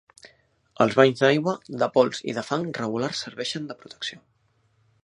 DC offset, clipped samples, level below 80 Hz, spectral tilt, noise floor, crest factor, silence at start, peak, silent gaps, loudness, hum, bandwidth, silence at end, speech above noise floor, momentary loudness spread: under 0.1%; under 0.1%; -68 dBFS; -5 dB/octave; -66 dBFS; 24 dB; 0.25 s; -2 dBFS; none; -24 LUFS; none; 11 kHz; 0.85 s; 42 dB; 15 LU